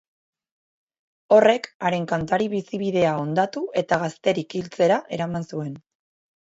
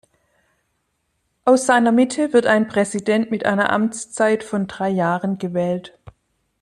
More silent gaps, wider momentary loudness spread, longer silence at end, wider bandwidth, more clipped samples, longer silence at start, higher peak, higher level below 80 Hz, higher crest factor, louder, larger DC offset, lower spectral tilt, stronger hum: first, 1.75-1.80 s vs none; first, 12 LU vs 8 LU; about the same, 0.7 s vs 0.75 s; second, 8 kHz vs 12 kHz; neither; second, 1.3 s vs 1.45 s; about the same, -4 dBFS vs -4 dBFS; about the same, -60 dBFS vs -62 dBFS; about the same, 20 dB vs 16 dB; second, -23 LUFS vs -19 LUFS; neither; about the same, -6 dB/octave vs -5 dB/octave; neither